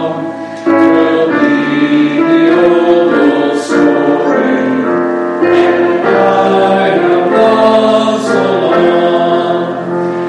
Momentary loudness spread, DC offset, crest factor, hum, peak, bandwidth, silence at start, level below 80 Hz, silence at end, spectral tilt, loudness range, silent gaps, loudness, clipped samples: 5 LU; under 0.1%; 10 dB; none; 0 dBFS; 10 kHz; 0 s; -54 dBFS; 0 s; -6 dB/octave; 1 LU; none; -10 LUFS; under 0.1%